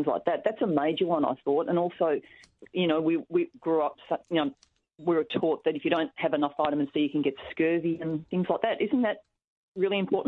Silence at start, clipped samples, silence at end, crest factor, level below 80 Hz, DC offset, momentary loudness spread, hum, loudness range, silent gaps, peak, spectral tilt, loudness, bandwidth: 0 s; under 0.1%; 0 s; 18 dB; -70 dBFS; under 0.1%; 5 LU; none; 1 LU; 9.44-9.72 s; -10 dBFS; -8.5 dB/octave; -28 LUFS; 6 kHz